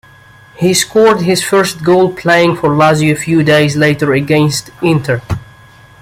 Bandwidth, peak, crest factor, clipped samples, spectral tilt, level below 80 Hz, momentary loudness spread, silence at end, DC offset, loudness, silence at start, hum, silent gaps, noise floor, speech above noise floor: 16 kHz; 0 dBFS; 12 dB; under 0.1%; -5 dB/octave; -42 dBFS; 6 LU; 0.6 s; under 0.1%; -11 LUFS; 0.6 s; none; none; -40 dBFS; 30 dB